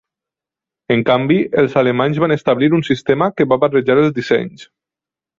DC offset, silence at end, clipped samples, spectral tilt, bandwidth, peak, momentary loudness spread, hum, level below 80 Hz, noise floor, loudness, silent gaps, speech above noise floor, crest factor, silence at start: under 0.1%; 0.75 s; under 0.1%; -7.5 dB/octave; 7.6 kHz; 0 dBFS; 4 LU; none; -54 dBFS; -88 dBFS; -15 LUFS; none; 74 dB; 16 dB; 0.9 s